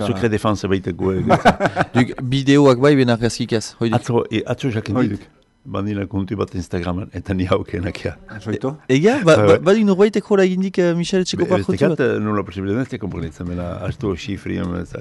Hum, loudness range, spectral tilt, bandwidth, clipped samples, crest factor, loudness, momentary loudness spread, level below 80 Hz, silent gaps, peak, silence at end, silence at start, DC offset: none; 8 LU; -6.5 dB/octave; 11.5 kHz; under 0.1%; 14 dB; -18 LUFS; 13 LU; -44 dBFS; none; -4 dBFS; 0 s; 0 s; under 0.1%